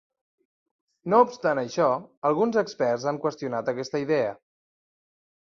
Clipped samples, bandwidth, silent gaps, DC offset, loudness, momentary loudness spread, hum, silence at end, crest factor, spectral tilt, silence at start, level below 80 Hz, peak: under 0.1%; 7.4 kHz; 2.17-2.22 s; under 0.1%; -25 LUFS; 8 LU; none; 1.15 s; 22 dB; -6 dB/octave; 1.05 s; -72 dBFS; -6 dBFS